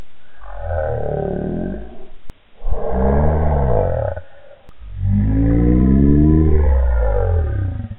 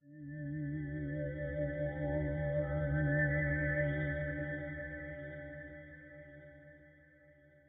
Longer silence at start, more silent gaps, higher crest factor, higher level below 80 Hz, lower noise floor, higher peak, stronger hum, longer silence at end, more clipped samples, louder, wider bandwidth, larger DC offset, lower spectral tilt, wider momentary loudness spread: about the same, 0 s vs 0.05 s; neither; about the same, 16 dB vs 16 dB; first, -20 dBFS vs -50 dBFS; second, -40 dBFS vs -63 dBFS; first, 0 dBFS vs -22 dBFS; neither; second, 0 s vs 0.35 s; neither; first, -18 LUFS vs -37 LUFS; about the same, 3.7 kHz vs 3.7 kHz; neither; first, -13 dB/octave vs -11 dB/octave; second, 16 LU vs 20 LU